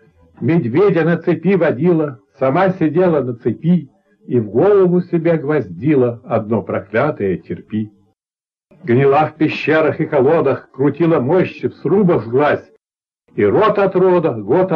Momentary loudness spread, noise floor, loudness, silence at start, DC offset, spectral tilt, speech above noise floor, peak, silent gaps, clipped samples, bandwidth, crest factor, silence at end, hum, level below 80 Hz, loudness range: 8 LU; under -90 dBFS; -15 LUFS; 0.4 s; under 0.1%; -10 dB/octave; over 75 dB; -4 dBFS; none; under 0.1%; 5.6 kHz; 12 dB; 0 s; none; -58 dBFS; 3 LU